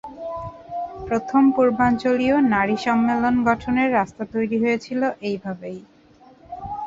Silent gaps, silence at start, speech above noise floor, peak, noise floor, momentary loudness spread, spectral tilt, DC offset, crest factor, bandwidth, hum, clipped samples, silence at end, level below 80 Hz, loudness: none; 0.05 s; 31 dB; -4 dBFS; -51 dBFS; 15 LU; -6.5 dB/octave; under 0.1%; 18 dB; 7.8 kHz; none; under 0.1%; 0 s; -50 dBFS; -21 LUFS